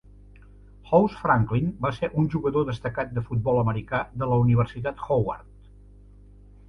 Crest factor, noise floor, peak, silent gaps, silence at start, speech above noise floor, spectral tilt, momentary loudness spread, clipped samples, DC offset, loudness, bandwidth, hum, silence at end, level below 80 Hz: 20 dB; -49 dBFS; -6 dBFS; none; 0.85 s; 25 dB; -9.5 dB/octave; 8 LU; under 0.1%; under 0.1%; -25 LUFS; 6.4 kHz; 50 Hz at -45 dBFS; 1.25 s; -46 dBFS